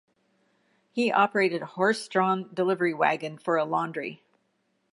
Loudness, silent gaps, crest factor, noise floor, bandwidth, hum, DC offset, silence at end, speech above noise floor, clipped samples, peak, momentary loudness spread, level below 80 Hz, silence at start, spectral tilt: -26 LUFS; none; 20 dB; -73 dBFS; 11.5 kHz; none; under 0.1%; 0.8 s; 47 dB; under 0.1%; -8 dBFS; 9 LU; -82 dBFS; 0.95 s; -5.5 dB/octave